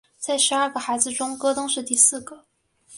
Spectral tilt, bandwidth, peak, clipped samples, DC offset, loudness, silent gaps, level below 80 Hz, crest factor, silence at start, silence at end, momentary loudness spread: 0 dB/octave; 11.5 kHz; -2 dBFS; under 0.1%; under 0.1%; -20 LUFS; none; -66 dBFS; 22 dB; 0.2 s; 0 s; 8 LU